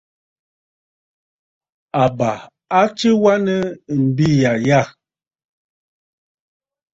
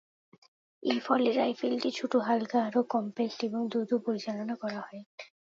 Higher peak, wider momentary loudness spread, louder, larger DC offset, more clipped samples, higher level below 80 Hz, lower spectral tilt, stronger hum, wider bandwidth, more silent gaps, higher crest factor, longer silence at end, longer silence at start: first, -2 dBFS vs -12 dBFS; second, 8 LU vs 11 LU; first, -17 LUFS vs -30 LUFS; neither; neither; first, -54 dBFS vs -82 dBFS; about the same, -6.5 dB/octave vs -5.5 dB/octave; neither; about the same, 7.8 kHz vs 7.4 kHz; second, none vs 5.06-5.18 s; about the same, 18 dB vs 18 dB; first, 2.05 s vs 0.35 s; first, 1.95 s vs 0.8 s